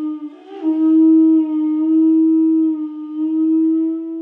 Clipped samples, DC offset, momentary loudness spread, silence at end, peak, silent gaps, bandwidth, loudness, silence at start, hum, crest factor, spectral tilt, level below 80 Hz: under 0.1%; under 0.1%; 13 LU; 0 s; -6 dBFS; none; 3.1 kHz; -15 LUFS; 0 s; none; 8 dB; -9 dB/octave; -84 dBFS